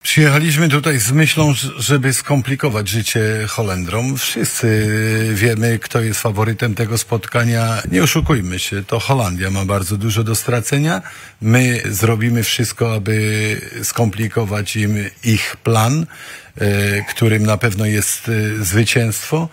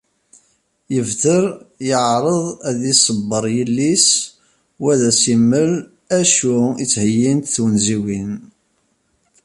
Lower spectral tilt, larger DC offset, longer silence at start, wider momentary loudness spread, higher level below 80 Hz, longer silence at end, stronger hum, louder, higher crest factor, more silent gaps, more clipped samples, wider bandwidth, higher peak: about the same, -4.5 dB/octave vs -4 dB/octave; neither; second, 0.05 s vs 0.9 s; second, 6 LU vs 10 LU; first, -40 dBFS vs -54 dBFS; second, 0.05 s vs 1.05 s; neither; about the same, -16 LUFS vs -16 LUFS; about the same, 16 dB vs 18 dB; neither; neither; first, 16.5 kHz vs 11.5 kHz; about the same, 0 dBFS vs 0 dBFS